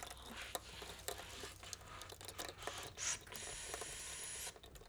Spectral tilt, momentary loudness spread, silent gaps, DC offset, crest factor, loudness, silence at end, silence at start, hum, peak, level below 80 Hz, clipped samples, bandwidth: -1 dB/octave; 9 LU; none; under 0.1%; 26 dB; -47 LUFS; 0 s; 0 s; none; -24 dBFS; -64 dBFS; under 0.1%; over 20 kHz